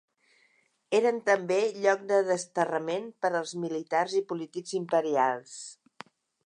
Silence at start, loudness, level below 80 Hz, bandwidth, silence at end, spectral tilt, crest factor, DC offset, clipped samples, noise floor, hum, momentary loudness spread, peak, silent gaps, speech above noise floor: 0.9 s; -28 LUFS; -84 dBFS; 11 kHz; 0.75 s; -4 dB/octave; 20 dB; under 0.1%; under 0.1%; -69 dBFS; none; 10 LU; -10 dBFS; none; 41 dB